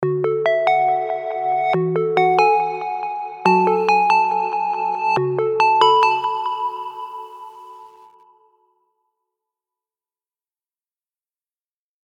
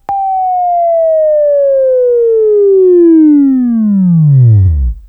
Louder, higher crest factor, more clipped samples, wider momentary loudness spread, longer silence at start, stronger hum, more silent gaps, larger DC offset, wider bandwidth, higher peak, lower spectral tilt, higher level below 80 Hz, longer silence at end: second, -18 LUFS vs -8 LUFS; first, 20 dB vs 8 dB; neither; first, 14 LU vs 6 LU; about the same, 0 s vs 0.1 s; neither; neither; neither; first, 9.4 kHz vs 2.5 kHz; about the same, 0 dBFS vs 0 dBFS; second, -6 dB/octave vs -14 dB/octave; second, -74 dBFS vs -24 dBFS; first, 4.15 s vs 0.1 s